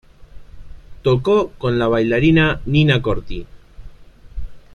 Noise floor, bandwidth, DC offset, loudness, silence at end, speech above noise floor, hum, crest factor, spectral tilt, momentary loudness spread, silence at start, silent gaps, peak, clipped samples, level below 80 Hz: -40 dBFS; 7 kHz; under 0.1%; -17 LUFS; 0.15 s; 24 dB; none; 16 dB; -8 dB/octave; 22 LU; 0.2 s; none; -2 dBFS; under 0.1%; -34 dBFS